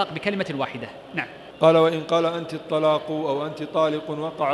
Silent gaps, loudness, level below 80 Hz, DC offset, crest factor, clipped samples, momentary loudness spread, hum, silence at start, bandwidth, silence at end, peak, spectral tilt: none; -23 LUFS; -66 dBFS; under 0.1%; 20 dB; under 0.1%; 12 LU; none; 0 s; 12 kHz; 0 s; -4 dBFS; -6.5 dB/octave